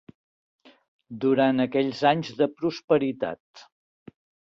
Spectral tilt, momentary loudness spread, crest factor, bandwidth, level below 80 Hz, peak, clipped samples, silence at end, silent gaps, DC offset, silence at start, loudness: -7 dB/octave; 11 LU; 20 dB; 7.4 kHz; -68 dBFS; -6 dBFS; under 0.1%; 0.85 s; 2.84-2.88 s, 3.40-3.54 s; under 0.1%; 1.1 s; -24 LUFS